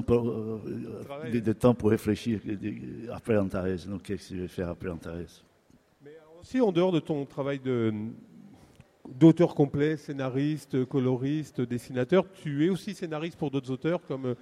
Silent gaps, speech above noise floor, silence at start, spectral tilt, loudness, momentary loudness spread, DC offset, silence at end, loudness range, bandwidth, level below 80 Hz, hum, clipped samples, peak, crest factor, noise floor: none; 35 dB; 0 s; -8 dB/octave; -29 LUFS; 13 LU; under 0.1%; 0.05 s; 7 LU; 14.5 kHz; -56 dBFS; none; under 0.1%; -8 dBFS; 22 dB; -63 dBFS